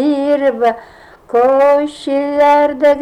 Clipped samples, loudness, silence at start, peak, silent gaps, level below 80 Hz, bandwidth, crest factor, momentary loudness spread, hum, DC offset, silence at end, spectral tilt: under 0.1%; -13 LUFS; 0 s; -4 dBFS; none; -52 dBFS; 10.5 kHz; 8 dB; 8 LU; none; under 0.1%; 0 s; -5 dB/octave